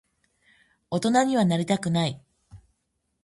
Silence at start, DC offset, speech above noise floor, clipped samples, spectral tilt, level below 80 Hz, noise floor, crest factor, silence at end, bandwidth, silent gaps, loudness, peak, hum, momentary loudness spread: 0.9 s; under 0.1%; 53 dB; under 0.1%; -5.5 dB/octave; -62 dBFS; -76 dBFS; 18 dB; 0.65 s; 11.5 kHz; none; -24 LUFS; -8 dBFS; none; 9 LU